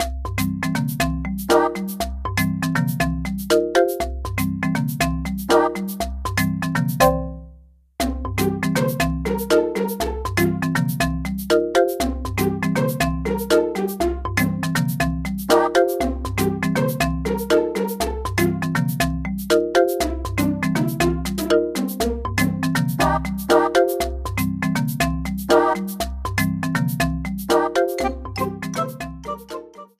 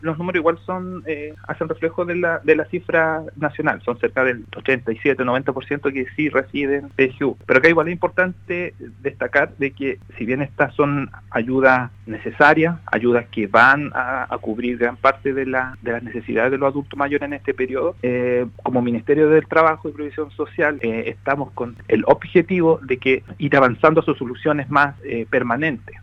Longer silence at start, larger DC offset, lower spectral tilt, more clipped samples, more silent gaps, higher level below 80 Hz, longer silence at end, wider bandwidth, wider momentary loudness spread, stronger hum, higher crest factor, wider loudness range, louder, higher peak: about the same, 0 s vs 0 s; neither; second, -5.5 dB/octave vs -8 dB/octave; neither; neither; first, -34 dBFS vs -52 dBFS; first, 0.15 s vs 0 s; first, 16 kHz vs 7.4 kHz; second, 8 LU vs 12 LU; neither; about the same, 18 dB vs 20 dB; about the same, 2 LU vs 4 LU; about the same, -21 LUFS vs -19 LUFS; about the same, -2 dBFS vs 0 dBFS